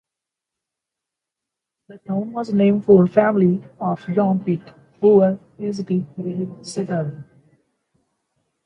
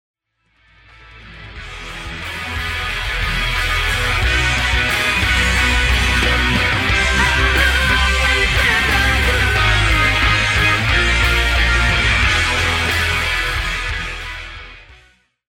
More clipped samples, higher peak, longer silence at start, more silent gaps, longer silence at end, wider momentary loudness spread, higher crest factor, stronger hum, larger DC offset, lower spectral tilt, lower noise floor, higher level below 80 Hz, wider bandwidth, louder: neither; about the same, -2 dBFS vs -2 dBFS; first, 1.9 s vs 1.15 s; neither; first, 1.4 s vs 0.6 s; about the same, 14 LU vs 12 LU; first, 20 dB vs 14 dB; neither; neither; first, -8.5 dB/octave vs -3.5 dB/octave; first, -85 dBFS vs -61 dBFS; second, -62 dBFS vs -22 dBFS; second, 10.5 kHz vs 16.5 kHz; second, -19 LUFS vs -15 LUFS